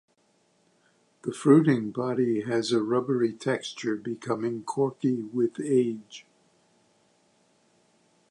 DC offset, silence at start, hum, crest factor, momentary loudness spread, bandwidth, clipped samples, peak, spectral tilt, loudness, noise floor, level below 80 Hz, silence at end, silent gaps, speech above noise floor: under 0.1%; 1.25 s; none; 22 dB; 12 LU; 11 kHz; under 0.1%; -6 dBFS; -6.5 dB/octave; -26 LUFS; -68 dBFS; -76 dBFS; 2.1 s; none; 42 dB